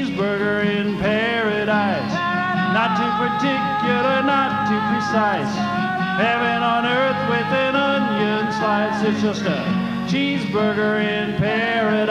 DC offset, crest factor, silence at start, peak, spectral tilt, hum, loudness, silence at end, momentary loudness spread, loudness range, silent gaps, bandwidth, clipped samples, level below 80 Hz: under 0.1%; 14 dB; 0 s; -6 dBFS; -6 dB/octave; none; -19 LUFS; 0 s; 3 LU; 1 LU; none; 10 kHz; under 0.1%; -52 dBFS